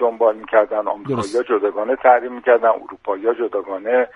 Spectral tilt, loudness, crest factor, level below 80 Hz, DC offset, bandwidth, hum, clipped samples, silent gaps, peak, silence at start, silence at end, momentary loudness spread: -6 dB/octave; -18 LUFS; 16 dB; -60 dBFS; under 0.1%; 10 kHz; none; under 0.1%; none; 0 dBFS; 0 s; 0.1 s; 8 LU